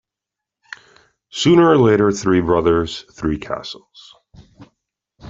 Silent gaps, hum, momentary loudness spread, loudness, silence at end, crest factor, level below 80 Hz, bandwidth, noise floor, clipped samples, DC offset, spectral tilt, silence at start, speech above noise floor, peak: none; none; 26 LU; -16 LUFS; 0 s; 16 dB; -44 dBFS; 7.8 kHz; -85 dBFS; under 0.1%; under 0.1%; -6 dB/octave; 1.35 s; 69 dB; -2 dBFS